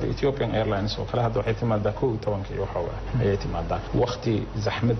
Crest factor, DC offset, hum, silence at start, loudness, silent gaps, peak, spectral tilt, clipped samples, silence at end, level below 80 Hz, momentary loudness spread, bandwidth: 12 dB; under 0.1%; none; 0 s; -26 LUFS; none; -14 dBFS; -6 dB/octave; under 0.1%; 0 s; -38 dBFS; 4 LU; 6.4 kHz